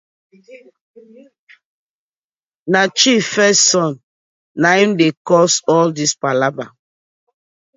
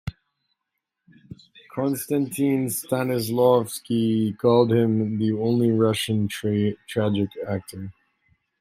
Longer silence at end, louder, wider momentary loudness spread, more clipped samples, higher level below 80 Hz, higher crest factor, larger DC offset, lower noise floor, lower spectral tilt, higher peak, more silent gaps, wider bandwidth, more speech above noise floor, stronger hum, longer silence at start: first, 1.1 s vs 0.7 s; first, -14 LUFS vs -23 LUFS; first, 18 LU vs 11 LU; neither; second, -66 dBFS vs -58 dBFS; about the same, 18 dB vs 18 dB; neither; first, under -90 dBFS vs -81 dBFS; second, -3 dB/octave vs -6 dB/octave; first, 0 dBFS vs -4 dBFS; first, 0.81-0.94 s, 1.39-1.47 s, 1.65-2.36 s, 2.46-2.66 s, 4.03-4.55 s, 5.17-5.25 s vs none; second, 8 kHz vs 16 kHz; first, over 75 dB vs 59 dB; neither; first, 0.5 s vs 0.05 s